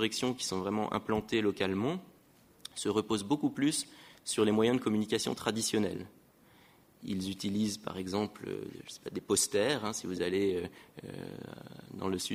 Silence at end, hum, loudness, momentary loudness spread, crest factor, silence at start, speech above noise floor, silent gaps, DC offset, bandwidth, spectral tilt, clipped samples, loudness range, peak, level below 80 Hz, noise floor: 0 s; none; -33 LUFS; 16 LU; 20 dB; 0 s; 29 dB; none; under 0.1%; 16 kHz; -4 dB/octave; under 0.1%; 4 LU; -14 dBFS; -66 dBFS; -62 dBFS